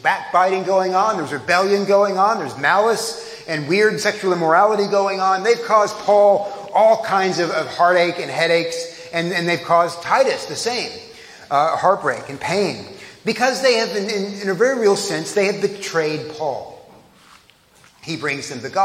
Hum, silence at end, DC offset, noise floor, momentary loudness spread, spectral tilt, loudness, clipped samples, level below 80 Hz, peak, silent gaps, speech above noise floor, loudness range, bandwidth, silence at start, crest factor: none; 0 s; under 0.1%; -51 dBFS; 11 LU; -4 dB/octave; -18 LUFS; under 0.1%; -66 dBFS; -2 dBFS; none; 34 dB; 5 LU; 15.5 kHz; 0.05 s; 16 dB